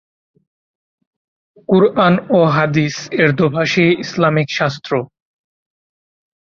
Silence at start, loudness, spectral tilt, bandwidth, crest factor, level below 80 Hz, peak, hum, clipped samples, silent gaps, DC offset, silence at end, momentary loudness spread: 1.7 s; -15 LUFS; -6.5 dB/octave; 7.4 kHz; 16 dB; -54 dBFS; -2 dBFS; none; under 0.1%; none; under 0.1%; 1.4 s; 9 LU